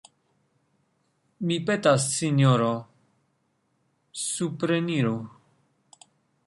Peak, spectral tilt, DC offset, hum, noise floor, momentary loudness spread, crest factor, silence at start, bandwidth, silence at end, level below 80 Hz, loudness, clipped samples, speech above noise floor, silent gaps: -8 dBFS; -5 dB/octave; under 0.1%; none; -72 dBFS; 13 LU; 20 dB; 1.4 s; 11.5 kHz; 1.15 s; -68 dBFS; -25 LUFS; under 0.1%; 48 dB; none